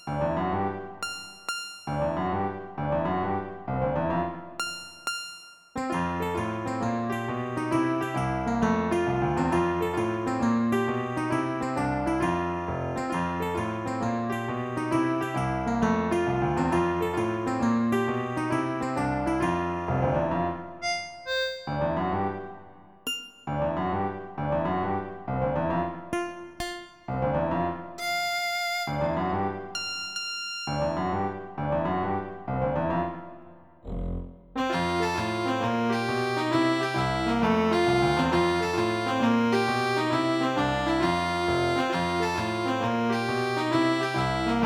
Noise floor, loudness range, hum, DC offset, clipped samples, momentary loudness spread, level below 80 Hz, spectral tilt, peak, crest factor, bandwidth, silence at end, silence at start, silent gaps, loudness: -50 dBFS; 6 LU; none; under 0.1%; under 0.1%; 9 LU; -48 dBFS; -6 dB/octave; -12 dBFS; 16 dB; 19 kHz; 0 s; 0 s; none; -28 LUFS